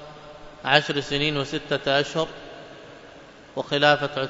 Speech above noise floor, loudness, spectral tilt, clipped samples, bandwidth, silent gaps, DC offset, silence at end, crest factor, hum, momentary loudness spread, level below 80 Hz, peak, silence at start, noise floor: 23 dB; -23 LUFS; -4.5 dB/octave; under 0.1%; 7.8 kHz; none; under 0.1%; 0 s; 24 dB; none; 23 LU; -52 dBFS; -2 dBFS; 0 s; -46 dBFS